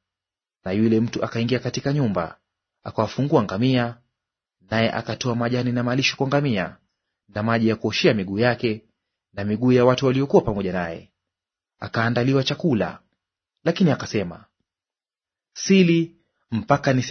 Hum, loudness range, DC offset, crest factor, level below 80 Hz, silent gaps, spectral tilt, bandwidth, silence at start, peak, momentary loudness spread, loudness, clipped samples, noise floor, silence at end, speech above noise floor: none; 3 LU; under 0.1%; 22 dB; -54 dBFS; none; -6 dB/octave; 6.6 kHz; 0.65 s; -2 dBFS; 13 LU; -22 LUFS; under 0.1%; under -90 dBFS; 0 s; over 69 dB